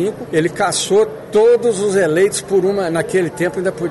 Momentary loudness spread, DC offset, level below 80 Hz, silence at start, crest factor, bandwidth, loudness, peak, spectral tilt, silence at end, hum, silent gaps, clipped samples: 6 LU; under 0.1%; -52 dBFS; 0 s; 10 dB; 12 kHz; -16 LUFS; -4 dBFS; -4.5 dB/octave; 0 s; none; none; under 0.1%